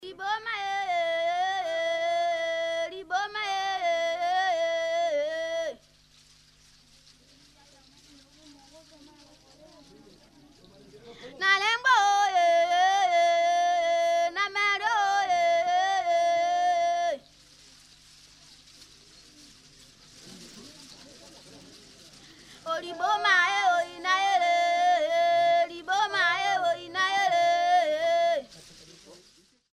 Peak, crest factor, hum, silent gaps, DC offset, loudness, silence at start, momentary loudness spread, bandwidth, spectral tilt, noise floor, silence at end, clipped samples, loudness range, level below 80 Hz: -10 dBFS; 18 dB; 50 Hz at -65 dBFS; none; under 0.1%; -25 LUFS; 0 s; 10 LU; 12 kHz; -1 dB/octave; -61 dBFS; 0.6 s; under 0.1%; 10 LU; -68 dBFS